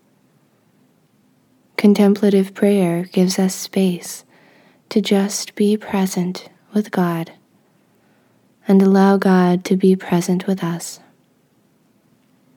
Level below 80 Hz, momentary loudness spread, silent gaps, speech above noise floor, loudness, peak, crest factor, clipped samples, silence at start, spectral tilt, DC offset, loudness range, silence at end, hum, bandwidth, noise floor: -70 dBFS; 15 LU; none; 42 dB; -17 LUFS; -2 dBFS; 18 dB; under 0.1%; 1.8 s; -6 dB/octave; under 0.1%; 4 LU; 1.6 s; none; 18 kHz; -58 dBFS